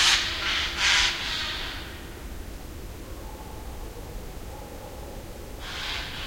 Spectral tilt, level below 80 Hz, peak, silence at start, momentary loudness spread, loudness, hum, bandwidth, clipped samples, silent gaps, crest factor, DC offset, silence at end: -1 dB/octave; -40 dBFS; -6 dBFS; 0 s; 20 LU; -24 LUFS; none; 16.5 kHz; under 0.1%; none; 24 dB; under 0.1%; 0 s